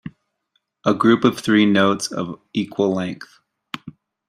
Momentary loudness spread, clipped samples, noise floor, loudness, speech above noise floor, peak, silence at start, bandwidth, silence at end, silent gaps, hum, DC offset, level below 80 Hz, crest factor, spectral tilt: 19 LU; under 0.1%; -71 dBFS; -19 LUFS; 52 dB; -2 dBFS; 0.05 s; 14.5 kHz; 0.4 s; none; none; under 0.1%; -62 dBFS; 18 dB; -5.5 dB/octave